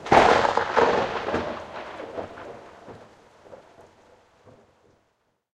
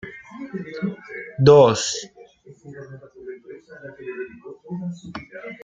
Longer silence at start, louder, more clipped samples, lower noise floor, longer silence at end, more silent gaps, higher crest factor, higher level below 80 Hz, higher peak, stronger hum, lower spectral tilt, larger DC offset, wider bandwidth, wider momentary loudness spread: about the same, 0 s vs 0.05 s; second, -23 LUFS vs -19 LUFS; neither; first, -71 dBFS vs -47 dBFS; first, 2 s vs 0.1 s; neither; about the same, 24 dB vs 22 dB; first, -52 dBFS vs -60 dBFS; about the same, -2 dBFS vs -2 dBFS; neither; about the same, -4.5 dB/octave vs -5.5 dB/octave; neither; first, 11.5 kHz vs 9.4 kHz; about the same, 27 LU vs 27 LU